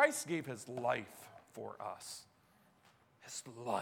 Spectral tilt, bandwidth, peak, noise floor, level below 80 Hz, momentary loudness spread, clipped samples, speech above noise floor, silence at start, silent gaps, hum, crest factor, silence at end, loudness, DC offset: -3.5 dB/octave; 17.5 kHz; -16 dBFS; -70 dBFS; -84 dBFS; 16 LU; under 0.1%; 30 dB; 0 s; none; none; 26 dB; 0 s; -41 LUFS; under 0.1%